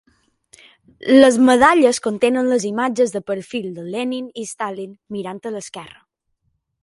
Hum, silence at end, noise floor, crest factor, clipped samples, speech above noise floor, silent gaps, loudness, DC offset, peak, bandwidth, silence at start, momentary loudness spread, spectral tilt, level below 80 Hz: none; 0.95 s; -70 dBFS; 18 dB; under 0.1%; 53 dB; none; -17 LUFS; under 0.1%; 0 dBFS; 11.5 kHz; 1.05 s; 18 LU; -4 dB/octave; -56 dBFS